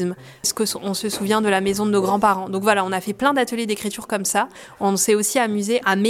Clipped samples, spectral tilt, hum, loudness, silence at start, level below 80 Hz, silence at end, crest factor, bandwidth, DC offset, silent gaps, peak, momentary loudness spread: under 0.1%; -3.5 dB/octave; none; -20 LUFS; 0 s; -58 dBFS; 0 s; 18 dB; 16.5 kHz; under 0.1%; none; -4 dBFS; 7 LU